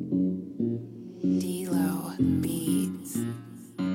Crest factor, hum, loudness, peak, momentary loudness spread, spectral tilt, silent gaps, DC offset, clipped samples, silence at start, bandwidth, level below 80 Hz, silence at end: 16 dB; none; -29 LUFS; -14 dBFS; 9 LU; -6.5 dB/octave; none; under 0.1%; under 0.1%; 0 s; 16.5 kHz; -58 dBFS; 0 s